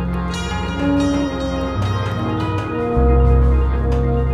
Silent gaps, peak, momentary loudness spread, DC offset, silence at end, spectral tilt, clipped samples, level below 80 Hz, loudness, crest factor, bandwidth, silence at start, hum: none; -4 dBFS; 8 LU; under 0.1%; 0 s; -7.5 dB/octave; under 0.1%; -20 dBFS; -19 LUFS; 14 dB; 8.6 kHz; 0 s; none